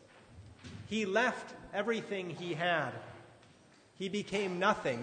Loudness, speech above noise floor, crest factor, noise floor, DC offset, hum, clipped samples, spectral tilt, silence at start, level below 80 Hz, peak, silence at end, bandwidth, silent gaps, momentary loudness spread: -34 LUFS; 28 dB; 22 dB; -62 dBFS; under 0.1%; none; under 0.1%; -4.5 dB/octave; 0.15 s; -68 dBFS; -14 dBFS; 0 s; 9.6 kHz; none; 19 LU